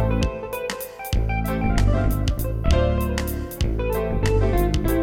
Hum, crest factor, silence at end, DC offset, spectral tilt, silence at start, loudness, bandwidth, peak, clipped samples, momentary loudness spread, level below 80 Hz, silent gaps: none; 18 dB; 0 s; under 0.1%; -6.5 dB/octave; 0 s; -23 LUFS; 17 kHz; -4 dBFS; under 0.1%; 8 LU; -24 dBFS; none